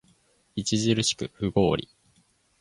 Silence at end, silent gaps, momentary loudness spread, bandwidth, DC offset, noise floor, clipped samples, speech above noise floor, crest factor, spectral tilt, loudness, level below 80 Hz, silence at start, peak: 0.8 s; none; 8 LU; 11.5 kHz; under 0.1%; -65 dBFS; under 0.1%; 40 dB; 20 dB; -4.5 dB/octave; -26 LUFS; -52 dBFS; 0.55 s; -8 dBFS